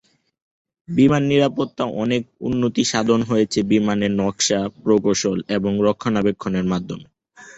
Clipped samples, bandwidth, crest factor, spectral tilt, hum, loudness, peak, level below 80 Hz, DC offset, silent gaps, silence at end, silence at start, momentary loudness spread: under 0.1%; 8.2 kHz; 16 dB; -5 dB/octave; none; -20 LUFS; -4 dBFS; -50 dBFS; under 0.1%; none; 0.05 s; 0.9 s; 7 LU